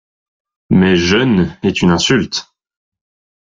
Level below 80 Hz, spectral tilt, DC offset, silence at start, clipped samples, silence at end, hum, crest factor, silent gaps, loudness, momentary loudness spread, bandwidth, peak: -44 dBFS; -5 dB/octave; under 0.1%; 0.7 s; under 0.1%; 1.15 s; none; 14 dB; none; -13 LUFS; 6 LU; 7.8 kHz; -2 dBFS